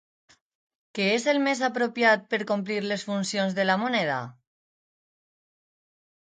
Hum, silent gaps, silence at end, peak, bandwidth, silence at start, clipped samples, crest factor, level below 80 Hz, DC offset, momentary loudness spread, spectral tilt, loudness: none; none; 1.95 s; -8 dBFS; 9.4 kHz; 0.95 s; under 0.1%; 20 dB; -76 dBFS; under 0.1%; 7 LU; -4.5 dB/octave; -25 LUFS